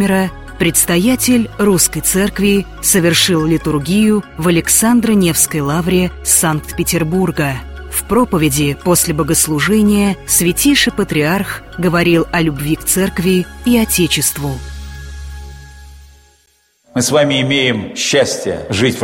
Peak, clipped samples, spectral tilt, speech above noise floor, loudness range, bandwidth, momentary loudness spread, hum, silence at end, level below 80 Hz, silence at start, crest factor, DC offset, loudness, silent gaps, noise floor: 0 dBFS; under 0.1%; -4 dB/octave; 43 dB; 6 LU; 16.5 kHz; 9 LU; none; 0 s; -32 dBFS; 0 s; 14 dB; under 0.1%; -13 LUFS; none; -56 dBFS